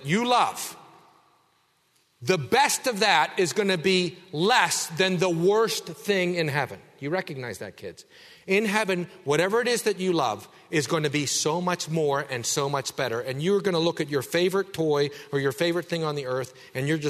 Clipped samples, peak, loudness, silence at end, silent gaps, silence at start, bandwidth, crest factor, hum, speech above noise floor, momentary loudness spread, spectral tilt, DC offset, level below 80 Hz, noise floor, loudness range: under 0.1%; -6 dBFS; -25 LUFS; 0 s; none; 0 s; 13.5 kHz; 20 dB; none; 41 dB; 10 LU; -4 dB/octave; under 0.1%; -68 dBFS; -67 dBFS; 5 LU